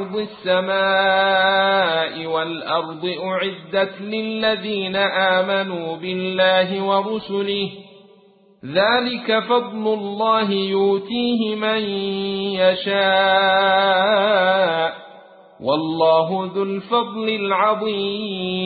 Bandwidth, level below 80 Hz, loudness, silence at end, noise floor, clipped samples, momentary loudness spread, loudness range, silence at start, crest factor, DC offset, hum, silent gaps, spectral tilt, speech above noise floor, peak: 4.8 kHz; -62 dBFS; -19 LUFS; 0 s; -52 dBFS; under 0.1%; 9 LU; 4 LU; 0 s; 16 dB; under 0.1%; none; none; -9.5 dB/octave; 33 dB; -4 dBFS